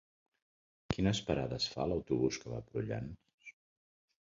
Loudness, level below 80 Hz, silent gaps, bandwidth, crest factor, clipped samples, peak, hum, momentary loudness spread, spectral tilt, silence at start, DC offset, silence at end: -36 LUFS; -56 dBFS; 3.34-3.38 s; 7.4 kHz; 24 dB; under 0.1%; -14 dBFS; none; 20 LU; -5.5 dB/octave; 0.9 s; under 0.1%; 0.7 s